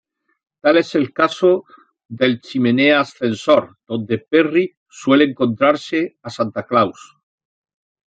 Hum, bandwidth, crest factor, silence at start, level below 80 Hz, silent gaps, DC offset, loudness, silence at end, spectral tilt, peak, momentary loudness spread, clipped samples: none; 9 kHz; 16 dB; 0.65 s; -64 dBFS; 4.77-4.86 s; under 0.1%; -17 LUFS; 1.25 s; -6 dB/octave; -2 dBFS; 9 LU; under 0.1%